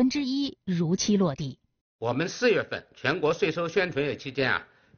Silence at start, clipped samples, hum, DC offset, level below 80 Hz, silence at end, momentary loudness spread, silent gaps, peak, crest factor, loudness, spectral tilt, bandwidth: 0 s; under 0.1%; none; under 0.1%; -60 dBFS; 0.35 s; 7 LU; 1.81-1.99 s; -8 dBFS; 18 dB; -27 LUFS; -4.5 dB/octave; 7 kHz